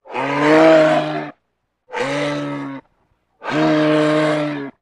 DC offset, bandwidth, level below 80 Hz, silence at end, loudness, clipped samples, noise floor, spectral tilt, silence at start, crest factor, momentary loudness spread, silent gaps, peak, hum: under 0.1%; 10.5 kHz; -62 dBFS; 0.1 s; -16 LUFS; under 0.1%; -71 dBFS; -6 dB/octave; 0.05 s; 16 dB; 20 LU; none; 0 dBFS; none